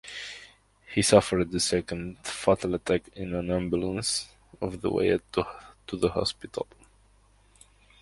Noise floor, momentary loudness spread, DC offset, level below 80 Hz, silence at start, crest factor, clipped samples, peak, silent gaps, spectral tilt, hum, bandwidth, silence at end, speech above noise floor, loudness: -61 dBFS; 16 LU; under 0.1%; -50 dBFS; 0.05 s; 26 dB; under 0.1%; -4 dBFS; none; -4.5 dB/octave; none; 11.5 kHz; 1.4 s; 34 dB; -28 LUFS